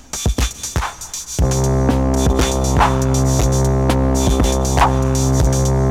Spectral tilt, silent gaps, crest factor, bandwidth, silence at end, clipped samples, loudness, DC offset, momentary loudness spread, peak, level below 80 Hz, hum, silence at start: -5.5 dB/octave; none; 14 dB; 16 kHz; 0 s; under 0.1%; -17 LUFS; under 0.1%; 7 LU; -2 dBFS; -20 dBFS; none; 0.15 s